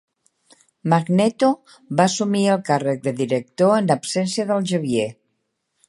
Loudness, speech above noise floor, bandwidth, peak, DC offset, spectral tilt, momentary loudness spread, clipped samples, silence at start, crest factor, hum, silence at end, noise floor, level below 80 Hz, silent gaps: -20 LUFS; 54 dB; 11.5 kHz; -2 dBFS; under 0.1%; -5.5 dB/octave; 6 LU; under 0.1%; 0.85 s; 20 dB; none; 0.75 s; -73 dBFS; -66 dBFS; none